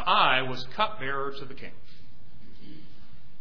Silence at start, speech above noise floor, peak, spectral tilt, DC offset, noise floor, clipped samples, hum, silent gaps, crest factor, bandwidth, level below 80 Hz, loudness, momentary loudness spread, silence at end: 0 s; 25 dB; -6 dBFS; -5 dB/octave; 4%; -54 dBFS; under 0.1%; none; none; 22 dB; 5.4 kHz; -56 dBFS; -27 LUFS; 29 LU; 0.25 s